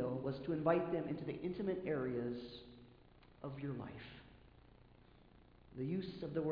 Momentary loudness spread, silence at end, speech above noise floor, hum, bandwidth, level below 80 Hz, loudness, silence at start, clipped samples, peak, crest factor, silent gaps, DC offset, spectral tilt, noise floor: 20 LU; 0 s; 24 dB; 60 Hz at -70 dBFS; 5.2 kHz; -66 dBFS; -42 LUFS; 0 s; under 0.1%; -22 dBFS; 22 dB; none; under 0.1%; -7 dB/octave; -64 dBFS